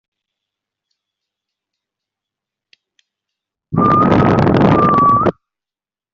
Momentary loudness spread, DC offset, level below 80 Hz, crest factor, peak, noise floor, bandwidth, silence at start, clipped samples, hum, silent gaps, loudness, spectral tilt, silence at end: 6 LU; under 0.1%; -42 dBFS; 14 dB; -2 dBFS; under -90 dBFS; 7.2 kHz; 3.7 s; under 0.1%; none; none; -12 LUFS; -7 dB/octave; 0.8 s